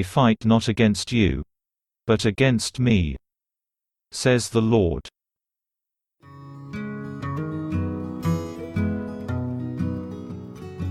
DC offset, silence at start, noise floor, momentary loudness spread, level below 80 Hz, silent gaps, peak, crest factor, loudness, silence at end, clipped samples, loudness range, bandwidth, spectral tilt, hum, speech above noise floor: under 0.1%; 0 s; -88 dBFS; 16 LU; -42 dBFS; none; -6 dBFS; 20 dB; -23 LUFS; 0 s; under 0.1%; 9 LU; 12.5 kHz; -6 dB/octave; none; 68 dB